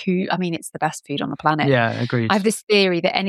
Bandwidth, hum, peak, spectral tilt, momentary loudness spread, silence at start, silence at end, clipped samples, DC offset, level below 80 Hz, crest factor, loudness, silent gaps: 13.5 kHz; none; -2 dBFS; -5 dB/octave; 8 LU; 0 s; 0 s; under 0.1%; under 0.1%; -64 dBFS; 18 dB; -20 LUFS; 2.63-2.67 s